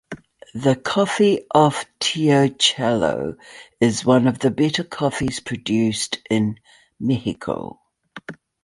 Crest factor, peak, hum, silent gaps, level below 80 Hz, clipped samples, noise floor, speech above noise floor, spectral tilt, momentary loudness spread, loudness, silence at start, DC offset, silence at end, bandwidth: 18 dB; -2 dBFS; none; none; -54 dBFS; under 0.1%; -39 dBFS; 20 dB; -5 dB/octave; 20 LU; -20 LUFS; 0.1 s; under 0.1%; 0.3 s; 11.5 kHz